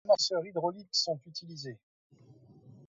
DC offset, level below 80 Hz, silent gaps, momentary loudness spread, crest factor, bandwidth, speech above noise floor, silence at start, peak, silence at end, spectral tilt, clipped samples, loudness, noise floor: under 0.1%; -82 dBFS; 1.83-2.10 s; 17 LU; 20 dB; 7.6 kHz; 23 dB; 0.05 s; -14 dBFS; 0.15 s; -3 dB/octave; under 0.1%; -32 LUFS; -58 dBFS